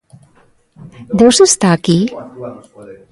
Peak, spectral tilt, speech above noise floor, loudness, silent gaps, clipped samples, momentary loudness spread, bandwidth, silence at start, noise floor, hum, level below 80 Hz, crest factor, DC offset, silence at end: 0 dBFS; -4.5 dB/octave; 39 dB; -11 LUFS; none; under 0.1%; 22 LU; 11.5 kHz; 1 s; -51 dBFS; none; -48 dBFS; 14 dB; under 0.1%; 0.2 s